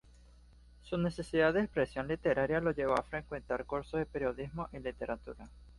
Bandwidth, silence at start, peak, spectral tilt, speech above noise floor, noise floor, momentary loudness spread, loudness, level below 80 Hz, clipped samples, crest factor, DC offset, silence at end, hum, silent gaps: 11.5 kHz; 0.85 s; -16 dBFS; -7 dB/octave; 24 dB; -59 dBFS; 11 LU; -35 LUFS; -54 dBFS; under 0.1%; 20 dB; under 0.1%; 0 s; none; none